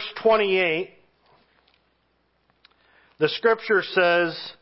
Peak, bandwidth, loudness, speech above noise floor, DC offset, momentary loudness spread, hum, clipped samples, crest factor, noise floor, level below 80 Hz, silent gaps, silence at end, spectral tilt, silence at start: -6 dBFS; 5.8 kHz; -21 LUFS; 47 dB; under 0.1%; 8 LU; none; under 0.1%; 20 dB; -68 dBFS; -70 dBFS; none; 0.1 s; -8.5 dB/octave; 0 s